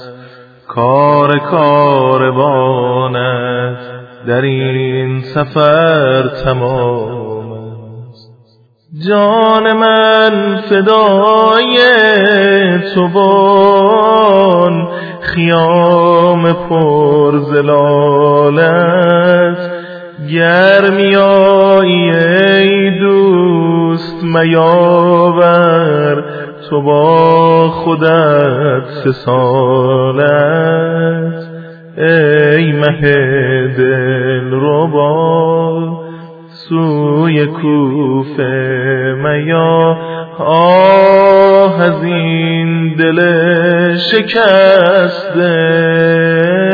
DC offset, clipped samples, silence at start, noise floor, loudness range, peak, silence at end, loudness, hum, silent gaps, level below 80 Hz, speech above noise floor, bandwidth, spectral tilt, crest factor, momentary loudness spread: under 0.1%; 0.4%; 0 s; -48 dBFS; 5 LU; 0 dBFS; 0 s; -9 LUFS; none; none; -46 dBFS; 39 dB; 5.4 kHz; -9 dB/octave; 10 dB; 10 LU